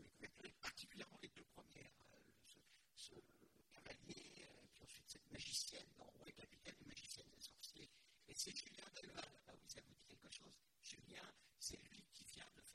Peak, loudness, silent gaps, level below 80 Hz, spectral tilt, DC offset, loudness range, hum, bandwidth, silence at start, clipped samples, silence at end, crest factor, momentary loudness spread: -32 dBFS; -56 LUFS; none; -80 dBFS; -1.5 dB/octave; under 0.1%; 9 LU; none; 16 kHz; 0 s; under 0.1%; 0 s; 28 dB; 17 LU